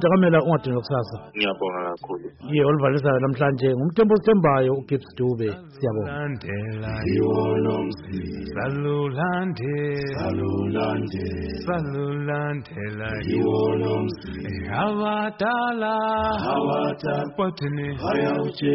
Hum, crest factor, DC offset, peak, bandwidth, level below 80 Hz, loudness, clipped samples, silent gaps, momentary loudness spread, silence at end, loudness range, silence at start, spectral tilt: none; 14 dB; under 0.1%; -8 dBFS; 5.8 kHz; -48 dBFS; -24 LUFS; under 0.1%; none; 10 LU; 0 s; 5 LU; 0 s; -6 dB/octave